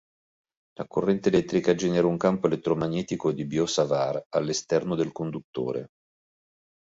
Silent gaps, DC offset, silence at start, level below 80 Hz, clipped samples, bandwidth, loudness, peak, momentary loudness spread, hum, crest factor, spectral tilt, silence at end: 4.26-4.31 s, 5.44-5.53 s; under 0.1%; 0.8 s; -60 dBFS; under 0.1%; 8 kHz; -26 LUFS; -8 dBFS; 9 LU; none; 18 dB; -5.5 dB/octave; 1 s